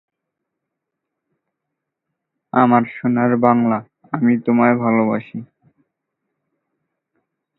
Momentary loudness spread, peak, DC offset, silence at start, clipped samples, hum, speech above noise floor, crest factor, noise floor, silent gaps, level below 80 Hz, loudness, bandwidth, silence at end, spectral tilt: 10 LU; 0 dBFS; under 0.1%; 2.55 s; under 0.1%; none; 64 dB; 20 dB; -80 dBFS; none; -66 dBFS; -17 LUFS; 4 kHz; 2.15 s; -11.5 dB/octave